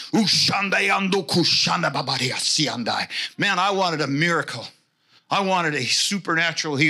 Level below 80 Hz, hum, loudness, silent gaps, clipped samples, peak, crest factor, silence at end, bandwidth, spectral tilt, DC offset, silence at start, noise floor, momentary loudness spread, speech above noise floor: -70 dBFS; none; -20 LUFS; none; under 0.1%; -6 dBFS; 16 dB; 0 s; 16 kHz; -3 dB/octave; under 0.1%; 0 s; -60 dBFS; 7 LU; 39 dB